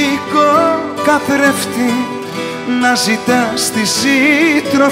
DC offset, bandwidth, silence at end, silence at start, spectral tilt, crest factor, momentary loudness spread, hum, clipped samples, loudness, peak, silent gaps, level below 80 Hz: under 0.1%; 16.5 kHz; 0 s; 0 s; -3 dB/octave; 12 dB; 8 LU; none; under 0.1%; -13 LUFS; 0 dBFS; none; -54 dBFS